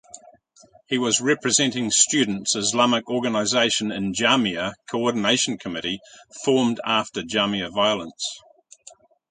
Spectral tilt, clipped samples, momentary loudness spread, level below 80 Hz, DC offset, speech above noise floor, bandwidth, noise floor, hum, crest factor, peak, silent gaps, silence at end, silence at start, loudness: -2.5 dB/octave; under 0.1%; 10 LU; -60 dBFS; under 0.1%; 32 dB; 9.6 kHz; -55 dBFS; none; 20 dB; -2 dBFS; none; 0.95 s; 0.15 s; -21 LUFS